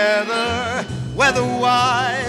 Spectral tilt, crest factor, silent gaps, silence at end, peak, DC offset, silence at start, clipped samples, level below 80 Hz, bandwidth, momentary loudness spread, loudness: -4 dB/octave; 16 dB; none; 0 s; -2 dBFS; under 0.1%; 0 s; under 0.1%; -44 dBFS; 14 kHz; 8 LU; -18 LUFS